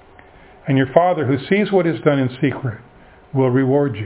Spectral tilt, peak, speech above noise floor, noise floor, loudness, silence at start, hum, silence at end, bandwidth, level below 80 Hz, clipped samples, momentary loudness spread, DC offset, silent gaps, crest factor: -11.5 dB/octave; 0 dBFS; 28 dB; -45 dBFS; -18 LUFS; 0.65 s; none; 0 s; 4 kHz; -52 dBFS; under 0.1%; 11 LU; under 0.1%; none; 18 dB